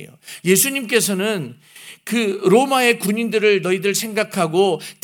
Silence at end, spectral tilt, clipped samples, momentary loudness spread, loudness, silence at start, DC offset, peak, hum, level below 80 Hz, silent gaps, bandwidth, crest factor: 0.1 s; -3.5 dB/octave; under 0.1%; 10 LU; -18 LUFS; 0 s; under 0.1%; -2 dBFS; none; -70 dBFS; none; over 20 kHz; 16 dB